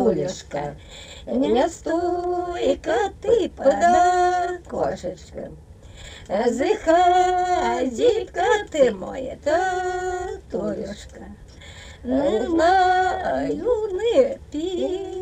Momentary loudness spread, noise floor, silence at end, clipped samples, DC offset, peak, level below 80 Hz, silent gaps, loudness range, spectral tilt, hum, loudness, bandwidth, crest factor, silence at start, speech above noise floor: 20 LU; -41 dBFS; 0 s; under 0.1%; under 0.1%; -6 dBFS; -44 dBFS; none; 4 LU; -5 dB/octave; none; -21 LUFS; 9.4 kHz; 16 dB; 0 s; 20 dB